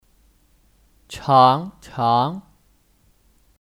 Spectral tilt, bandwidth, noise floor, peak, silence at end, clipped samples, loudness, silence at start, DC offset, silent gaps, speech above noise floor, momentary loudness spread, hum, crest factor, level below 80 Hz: -6.5 dB/octave; 15 kHz; -59 dBFS; -2 dBFS; 1.2 s; under 0.1%; -18 LUFS; 1.1 s; under 0.1%; none; 42 dB; 21 LU; none; 22 dB; -56 dBFS